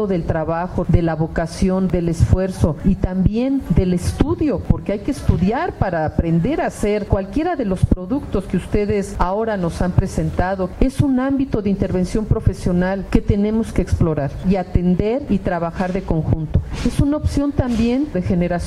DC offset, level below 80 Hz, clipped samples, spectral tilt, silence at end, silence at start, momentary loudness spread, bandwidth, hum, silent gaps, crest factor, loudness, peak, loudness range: under 0.1%; -26 dBFS; under 0.1%; -8 dB/octave; 0 s; 0 s; 4 LU; 12.5 kHz; none; none; 18 dB; -19 LUFS; 0 dBFS; 2 LU